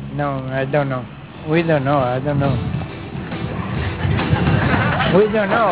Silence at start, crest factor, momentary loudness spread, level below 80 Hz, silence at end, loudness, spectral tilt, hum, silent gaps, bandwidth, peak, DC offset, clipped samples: 0 s; 16 dB; 12 LU; -34 dBFS; 0 s; -19 LUFS; -11 dB/octave; none; none; 4 kHz; -2 dBFS; under 0.1%; under 0.1%